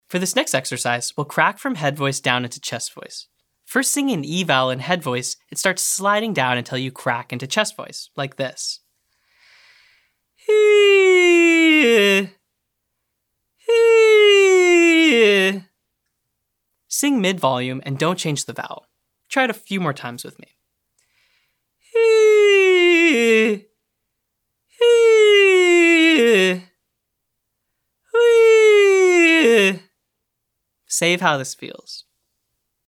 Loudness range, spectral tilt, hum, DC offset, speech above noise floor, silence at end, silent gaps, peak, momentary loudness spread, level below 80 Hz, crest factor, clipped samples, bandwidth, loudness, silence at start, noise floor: 10 LU; -3.5 dB/octave; none; under 0.1%; 58 dB; 0.85 s; none; 0 dBFS; 17 LU; -78 dBFS; 18 dB; under 0.1%; 17.5 kHz; -16 LUFS; 0.1 s; -77 dBFS